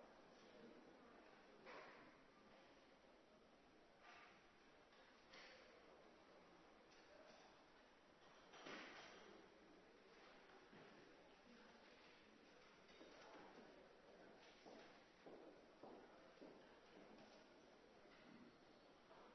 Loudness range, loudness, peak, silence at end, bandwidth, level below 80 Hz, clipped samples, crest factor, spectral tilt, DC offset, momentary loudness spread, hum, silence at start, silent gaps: 4 LU; -66 LUFS; -44 dBFS; 0 s; 6.2 kHz; -88 dBFS; under 0.1%; 22 dB; -2 dB/octave; under 0.1%; 7 LU; none; 0 s; none